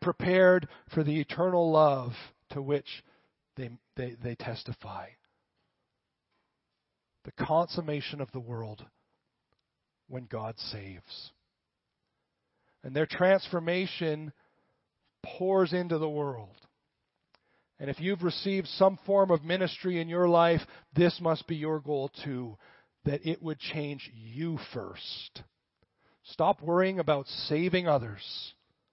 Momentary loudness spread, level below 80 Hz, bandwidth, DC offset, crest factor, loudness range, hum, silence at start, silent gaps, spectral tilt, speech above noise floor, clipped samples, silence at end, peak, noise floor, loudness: 20 LU; -64 dBFS; 5.8 kHz; under 0.1%; 22 dB; 15 LU; none; 0 s; none; -10 dB/octave; 55 dB; under 0.1%; 0.4 s; -10 dBFS; -85 dBFS; -30 LUFS